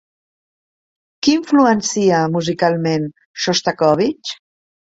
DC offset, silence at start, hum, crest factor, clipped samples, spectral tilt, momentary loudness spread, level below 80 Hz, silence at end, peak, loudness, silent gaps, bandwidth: under 0.1%; 1.25 s; none; 16 dB; under 0.1%; -4.5 dB/octave; 12 LU; -58 dBFS; 0.6 s; -2 dBFS; -16 LUFS; 3.25-3.34 s; 7.8 kHz